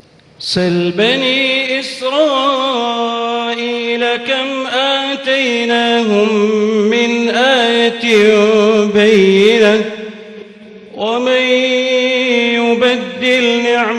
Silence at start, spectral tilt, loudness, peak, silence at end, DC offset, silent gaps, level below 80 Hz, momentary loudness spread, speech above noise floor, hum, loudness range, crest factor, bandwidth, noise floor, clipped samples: 0.4 s; -4.5 dB/octave; -12 LUFS; 0 dBFS; 0 s; under 0.1%; none; -58 dBFS; 8 LU; 23 dB; none; 4 LU; 12 dB; 11.5 kHz; -36 dBFS; under 0.1%